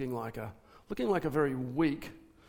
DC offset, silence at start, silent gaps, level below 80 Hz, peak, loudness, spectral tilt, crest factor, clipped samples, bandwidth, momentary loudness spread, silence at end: under 0.1%; 0 s; none; -60 dBFS; -18 dBFS; -33 LUFS; -7.5 dB/octave; 16 dB; under 0.1%; 17.5 kHz; 14 LU; 0.25 s